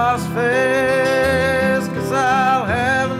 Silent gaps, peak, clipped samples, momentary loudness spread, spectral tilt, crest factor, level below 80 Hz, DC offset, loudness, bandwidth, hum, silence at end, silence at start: none; -6 dBFS; under 0.1%; 3 LU; -5 dB/octave; 10 dB; -46 dBFS; under 0.1%; -17 LUFS; 15.5 kHz; none; 0 s; 0 s